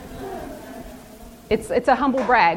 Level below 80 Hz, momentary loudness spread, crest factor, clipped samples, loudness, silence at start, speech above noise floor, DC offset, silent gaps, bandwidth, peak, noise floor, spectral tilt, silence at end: -44 dBFS; 23 LU; 20 dB; under 0.1%; -20 LUFS; 0 s; 24 dB; under 0.1%; none; 17 kHz; -4 dBFS; -42 dBFS; -5 dB/octave; 0 s